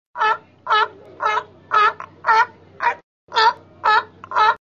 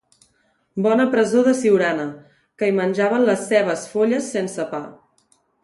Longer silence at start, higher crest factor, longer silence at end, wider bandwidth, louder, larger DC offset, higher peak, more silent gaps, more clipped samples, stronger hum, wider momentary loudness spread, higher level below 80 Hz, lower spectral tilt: second, 0.15 s vs 0.75 s; about the same, 16 dB vs 16 dB; second, 0.05 s vs 0.7 s; second, 7.4 kHz vs 11.5 kHz; about the same, -19 LUFS vs -19 LUFS; neither; about the same, -4 dBFS vs -4 dBFS; first, 3.03-3.27 s vs none; neither; neither; second, 8 LU vs 11 LU; about the same, -64 dBFS vs -68 dBFS; second, -1.5 dB/octave vs -5.5 dB/octave